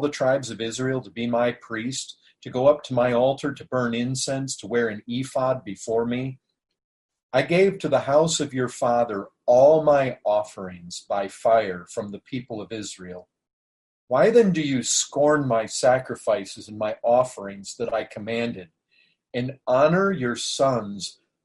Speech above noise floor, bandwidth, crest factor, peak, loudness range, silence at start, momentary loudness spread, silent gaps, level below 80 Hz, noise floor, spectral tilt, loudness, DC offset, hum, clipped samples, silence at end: 42 dB; 11.5 kHz; 18 dB; -6 dBFS; 6 LU; 0 s; 14 LU; 6.84-7.09 s, 7.23-7.29 s, 13.53-14.08 s; -62 dBFS; -64 dBFS; -4.5 dB/octave; -23 LUFS; under 0.1%; none; under 0.1%; 0.35 s